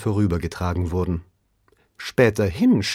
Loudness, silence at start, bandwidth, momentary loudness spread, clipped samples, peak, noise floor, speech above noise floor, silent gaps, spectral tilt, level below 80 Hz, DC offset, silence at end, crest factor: -22 LUFS; 0 s; 15.5 kHz; 9 LU; under 0.1%; -4 dBFS; -63 dBFS; 42 dB; none; -6.5 dB/octave; -40 dBFS; under 0.1%; 0 s; 18 dB